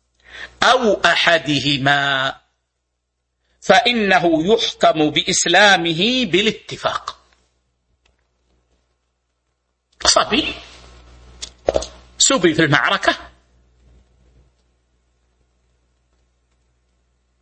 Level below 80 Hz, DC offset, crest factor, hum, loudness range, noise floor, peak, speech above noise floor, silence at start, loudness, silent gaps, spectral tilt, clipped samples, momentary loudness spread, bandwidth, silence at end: -48 dBFS; under 0.1%; 20 dB; none; 9 LU; -74 dBFS; 0 dBFS; 58 dB; 0.35 s; -15 LUFS; none; -2.5 dB/octave; under 0.1%; 14 LU; 8.8 kHz; 4.15 s